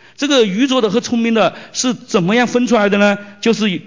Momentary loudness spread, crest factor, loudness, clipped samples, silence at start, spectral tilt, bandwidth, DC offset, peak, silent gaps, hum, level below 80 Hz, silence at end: 5 LU; 12 dB; -15 LUFS; under 0.1%; 0.2 s; -4.5 dB/octave; 7.6 kHz; 0.2%; -2 dBFS; none; none; -56 dBFS; 0.05 s